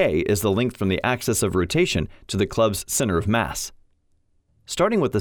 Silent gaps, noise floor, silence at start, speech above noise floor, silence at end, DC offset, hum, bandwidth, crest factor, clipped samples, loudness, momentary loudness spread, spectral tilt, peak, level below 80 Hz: none; -64 dBFS; 0 s; 42 dB; 0 s; under 0.1%; none; over 20 kHz; 16 dB; under 0.1%; -22 LUFS; 7 LU; -4.5 dB/octave; -6 dBFS; -44 dBFS